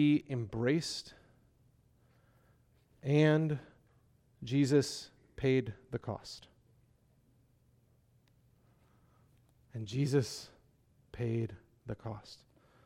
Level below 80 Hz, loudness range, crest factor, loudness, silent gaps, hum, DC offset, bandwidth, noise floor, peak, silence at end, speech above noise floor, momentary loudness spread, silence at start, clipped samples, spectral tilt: -66 dBFS; 9 LU; 20 dB; -34 LUFS; none; none; under 0.1%; 14 kHz; -69 dBFS; -16 dBFS; 0.5 s; 36 dB; 22 LU; 0 s; under 0.1%; -6.5 dB/octave